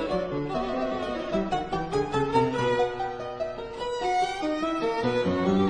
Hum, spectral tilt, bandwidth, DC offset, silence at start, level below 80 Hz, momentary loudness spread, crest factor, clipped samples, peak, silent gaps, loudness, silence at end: none; -6 dB/octave; 10 kHz; under 0.1%; 0 s; -48 dBFS; 8 LU; 16 dB; under 0.1%; -10 dBFS; none; -28 LUFS; 0 s